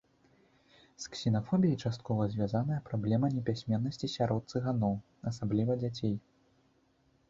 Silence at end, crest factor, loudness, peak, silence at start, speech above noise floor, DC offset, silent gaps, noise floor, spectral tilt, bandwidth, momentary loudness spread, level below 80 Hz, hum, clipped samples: 1.1 s; 16 dB; -33 LUFS; -16 dBFS; 1 s; 38 dB; under 0.1%; none; -70 dBFS; -7.5 dB/octave; 7.8 kHz; 7 LU; -62 dBFS; none; under 0.1%